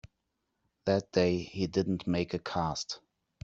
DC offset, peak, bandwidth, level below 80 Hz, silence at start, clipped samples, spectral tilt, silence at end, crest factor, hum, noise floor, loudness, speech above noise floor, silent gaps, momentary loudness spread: under 0.1%; -12 dBFS; 8 kHz; -60 dBFS; 0.05 s; under 0.1%; -6 dB/octave; 0.45 s; 22 dB; none; -82 dBFS; -32 LUFS; 51 dB; none; 9 LU